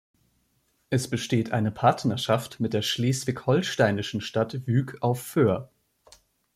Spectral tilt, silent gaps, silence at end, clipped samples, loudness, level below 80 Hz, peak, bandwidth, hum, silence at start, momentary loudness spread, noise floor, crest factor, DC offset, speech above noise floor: -5.5 dB/octave; none; 0.9 s; under 0.1%; -26 LUFS; -62 dBFS; -6 dBFS; 16 kHz; none; 0.9 s; 6 LU; -70 dBFS; 20 dB; under 0.1%; 45 dB